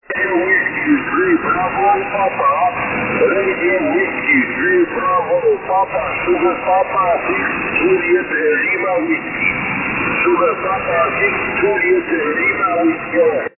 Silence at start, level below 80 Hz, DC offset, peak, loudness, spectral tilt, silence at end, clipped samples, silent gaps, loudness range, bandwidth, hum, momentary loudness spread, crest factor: 0.1 s; -46 dBFS; under 0.1%; -4 dBFS; -15 LUFS; -9.5 dB/octave; 0.1 s; under 0.1%; none; 1 LU; 3 kHz; none; 3 LU; 12 dB